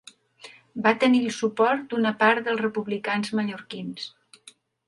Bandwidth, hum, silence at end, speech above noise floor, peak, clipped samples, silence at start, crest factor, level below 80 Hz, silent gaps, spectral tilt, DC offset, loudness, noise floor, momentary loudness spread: 11.5 kHz; none; 0.8 s; 30 dB; -6 dBFS; under 0.1%; 0.45 s; 18 dB; -74 dBFS; none; -5 dB/octave; under 0.1%; -24 LUFS; -54 dBFS; 15 LU